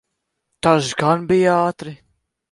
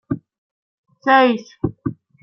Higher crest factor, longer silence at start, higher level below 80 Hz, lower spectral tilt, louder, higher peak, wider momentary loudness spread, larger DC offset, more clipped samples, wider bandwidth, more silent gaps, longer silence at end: about the same, 18 dB vs 18 dB; first, 0.65 s vs 0.1 s; about the same, -54 dBFS vs -50 dBFS; second, -5.5 dB/octave vs -7 dB/octave; about the same, -17 LUFS vs -18 LUFS; about the same, 0 dBFS vs -2 dBFS; second, 13 LU vs 16 LU; neither; neither; first, 11.5 kHz vs 6.4 kHz; second, none vs 0.38-0.84 s; first, 0.55 s vs 0.3 s